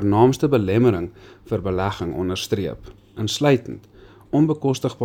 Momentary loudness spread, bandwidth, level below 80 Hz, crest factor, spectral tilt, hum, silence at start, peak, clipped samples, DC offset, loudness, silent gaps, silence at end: 16 LU; 17 kHz; -48 dBFS; 18 dB; -6.5 dB/octave; none; 0 s; -2 dBFS; under 0.1%; under 0.1%; -21 LUFS; none; 0 s